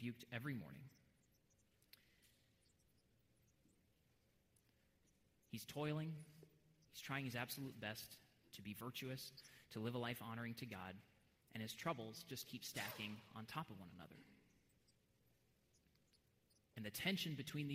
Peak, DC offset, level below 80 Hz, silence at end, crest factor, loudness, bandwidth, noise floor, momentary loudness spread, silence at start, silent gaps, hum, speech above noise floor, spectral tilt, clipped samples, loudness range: -28 dBFS; under 0.1%; -82 dBFS; 0 s; 24 dB; -49 LUFS; 16 kHz; -79 dBFS; 17 LU; 0 s; none; none; 30 dB; -4.5 dB/octave; under 0.1%; 9 LU